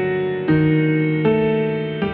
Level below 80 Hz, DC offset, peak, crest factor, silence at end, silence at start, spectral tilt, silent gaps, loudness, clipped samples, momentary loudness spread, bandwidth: -46 dBFS; under 0.1%; -6 dBFS; 12 dB; 0 s; 0 s; -11 dB/octave; none; -18 LUFS; under 0.1%; 5 LU; 4.5 kHz